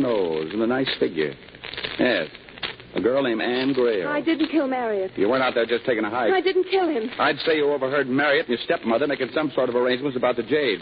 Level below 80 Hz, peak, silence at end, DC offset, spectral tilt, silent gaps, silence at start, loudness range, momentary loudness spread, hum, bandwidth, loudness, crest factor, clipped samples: -60 dBFS; -8 dBFS; 0 s; under 0.1%; -9.5 dB/octave; none; 0 s; 3 LU; 6 LU; none; 5.2 kHz; -23 LUFS; 16 dB; under 0.1%